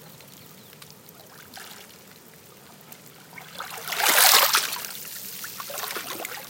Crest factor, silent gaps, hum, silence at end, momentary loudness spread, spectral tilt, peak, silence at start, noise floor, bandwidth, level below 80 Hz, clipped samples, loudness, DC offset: 28 dB; none; none; 0 s; 30 LU; 1 dB/octave; 0 dBFS; 0 s; -49 dBFS; 17 kHz; -74 dBFS; under 0.1%; -21 LUFS; under 0.1%